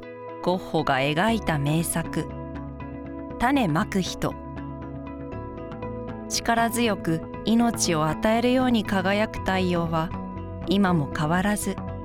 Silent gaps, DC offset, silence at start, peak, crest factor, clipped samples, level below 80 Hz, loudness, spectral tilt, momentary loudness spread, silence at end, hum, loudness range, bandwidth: none; under 0.1%; 0 s; -6 dBFS; 20 dB; under 0.1%; -44 dBFS; -24 LUFS; -5 dB/octave; 14 LU; 0 s; none; 5 LU; 18.5 kHz